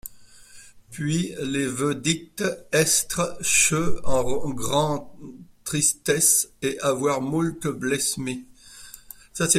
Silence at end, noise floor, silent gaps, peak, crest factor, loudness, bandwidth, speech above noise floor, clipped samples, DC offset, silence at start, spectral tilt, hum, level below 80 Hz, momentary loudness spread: 0 s; -47 dBFS; none; -4 dBFS; 20 dB; -23 LUFS; 16 kHz; 24 dB; under 0.1%; under 0.1%; 0.05 s; -3 dB/octave; none; -46 dBFS; 22 LU